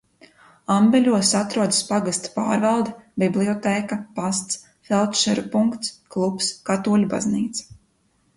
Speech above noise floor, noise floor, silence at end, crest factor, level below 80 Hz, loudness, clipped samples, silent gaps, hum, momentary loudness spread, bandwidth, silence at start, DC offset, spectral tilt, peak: 43 dB; -64 dBFS; 0.75 s; 16 dB; -60 dBFS; -21 LUFS; under 0.1%; none; none; 11 LU; 11.5 kHz; 0.7 s; under 0.1%; -4 dB/octave; -6 dBFS